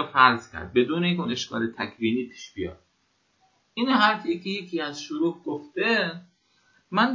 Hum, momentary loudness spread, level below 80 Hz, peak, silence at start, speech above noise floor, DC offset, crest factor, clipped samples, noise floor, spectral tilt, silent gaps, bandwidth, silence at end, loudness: none; 15 LU; -58 dBFS; -2 dBFS; 0 s; 44 dB; under 0.1%; 24 dB; under 0.1%; -69 dBFS; -5 dB/octave; none; 7.4 kHz; 0 s; -25 LUFS